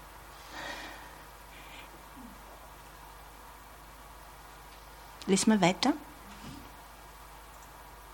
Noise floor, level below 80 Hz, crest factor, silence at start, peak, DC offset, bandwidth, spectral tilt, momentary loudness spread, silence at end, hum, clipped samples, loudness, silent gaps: -51 dBFS; -56 dBFS; 26 dB; 0 s; -10 dBFS; under 0.1%; 18 kHz; -4 dB/octave; 23 LU; 0 s; 50 Hz at -55 dBFS; under 0.1%; -30 LUFS; none